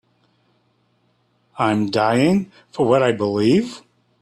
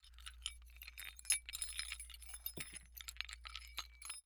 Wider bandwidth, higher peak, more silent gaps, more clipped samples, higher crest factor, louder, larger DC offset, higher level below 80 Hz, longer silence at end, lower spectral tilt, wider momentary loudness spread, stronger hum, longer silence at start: second, 12.5 kHz vs over 20 kHz; first, -2 dBFS vs -20 dBFS; neither; neither; second, 18 dB vs 28 dB; first, -18 LUFS vs -45 LUFS; neither; about the same, -58 dBFS vs -60 dBFS; first, 0.4 s vs 0.05 s; first, -6.5 dB/octave vs 0.5 dB/octave; second, 11 LU vs 14 LU; first, 60 Hz at -45 dBFS vs none; first, 1.55 s vs 0 s